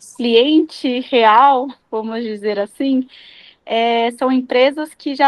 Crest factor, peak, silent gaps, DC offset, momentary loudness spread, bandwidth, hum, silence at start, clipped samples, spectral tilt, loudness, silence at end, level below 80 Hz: 16 dB; 0 dBFS; none; under 0.1%; 13 LU; 12 kHz; none; 0.2 s; under 0.1%; -4 dB/octave; -16 LUFS; 0 s; -66 dBFS